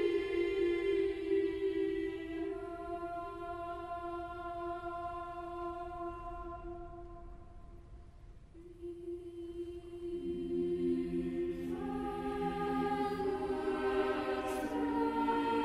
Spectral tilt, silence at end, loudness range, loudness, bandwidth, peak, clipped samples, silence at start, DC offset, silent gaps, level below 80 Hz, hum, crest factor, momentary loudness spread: -6.5 dB/octave; 0 s; 13 LU; -37 LUFS; 13.5 kHz; -22 dBFS; under 0.1%; 0 s; under 0.1%; none; -56 dBFS; none; 16 dB; 16 LU